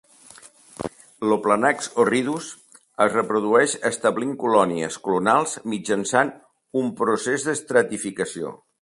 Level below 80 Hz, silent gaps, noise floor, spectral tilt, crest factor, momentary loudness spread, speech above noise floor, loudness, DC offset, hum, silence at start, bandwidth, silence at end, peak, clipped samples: -64 dBFS; none; -48 dBFS; -4 dB/octave; 20 dB; 12 LU; 27 dB; -22 LUFS; under 0.1%; none; 0.45 s; 11.5 kHz; 0.25 s; -2 dBFS; under 0.1%